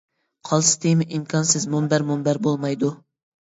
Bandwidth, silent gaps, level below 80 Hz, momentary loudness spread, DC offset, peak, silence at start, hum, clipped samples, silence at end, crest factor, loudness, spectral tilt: 8 kHz; none; -64 dBFS; 7 LU; under 0.1%; -4 dBFS; 0.45 s; none; under 0.1%; 0.45 s; 18 dB; -21 LUFS; -4.5 dB/octave